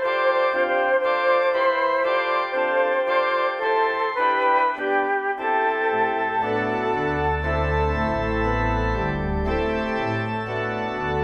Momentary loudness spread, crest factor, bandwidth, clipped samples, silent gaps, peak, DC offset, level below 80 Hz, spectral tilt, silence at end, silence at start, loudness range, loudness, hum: 5 LU; 14 dB; 7 kHz; under 0.1%; none; -8 dBFS; under 0.1%; -36 dBFS; -7 dB/octave; 0 s; 0 s; 3 LU; -22 LUFS; none